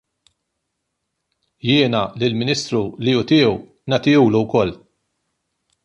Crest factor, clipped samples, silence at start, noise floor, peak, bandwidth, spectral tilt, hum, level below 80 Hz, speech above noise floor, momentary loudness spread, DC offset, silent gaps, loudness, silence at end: 18 dB; under 0.1%; 1.65 s; -76 dBFS; -2 dBFS; 10.5 kHz; -6 dB/octave; none; -52 dBFS; 59 dB; 8 LU; under 0.1%; none; -18 LUFS; 1.1 s